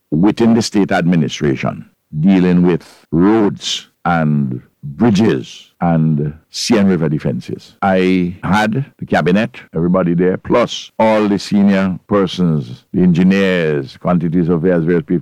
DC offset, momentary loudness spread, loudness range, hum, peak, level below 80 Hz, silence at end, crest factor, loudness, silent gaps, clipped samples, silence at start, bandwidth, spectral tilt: under 0.1%; 9 LU; 2 LU; none; -2 dBFS; -46 dBFS; 0 s; 12 dB; -15 LUFS; none; under 0.1%; 0.1 s; 11.5 kHz; -6.5 dB/octave